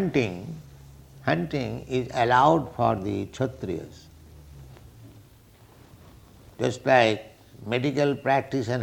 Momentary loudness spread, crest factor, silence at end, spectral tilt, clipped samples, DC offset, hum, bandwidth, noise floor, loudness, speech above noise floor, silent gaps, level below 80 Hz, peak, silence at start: 15 LU; 22 dB; 0 s; -6 dB/octave; under 0.1%; under 0.1%; none; 19 kHz; -53 dBFS; -25 LUFS; 29 dB; none; -54 dBFS; -4 dBFS; 0 s